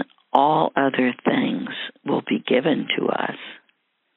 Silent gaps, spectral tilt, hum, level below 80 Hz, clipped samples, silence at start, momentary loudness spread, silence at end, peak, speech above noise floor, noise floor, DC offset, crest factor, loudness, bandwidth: none; -3 dB/octave; none; -74 dBFS; under 0.1%; 0 s; 11 LU; 0.6 s; 0 dBFS; 47 dB; -67 dBFS; under 0.1%; 22 dB; -22 LUFS; 4.2 kHz